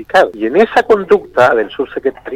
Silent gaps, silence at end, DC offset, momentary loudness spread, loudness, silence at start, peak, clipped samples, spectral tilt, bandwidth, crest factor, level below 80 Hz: none; 0 s; under 0.1%; 8 LU; -12 LUFS; 0 s; 0 dBFS; under 0.1%; -5.5 dB/octave; 12.5 kHz; 12 dB; -46 dBFS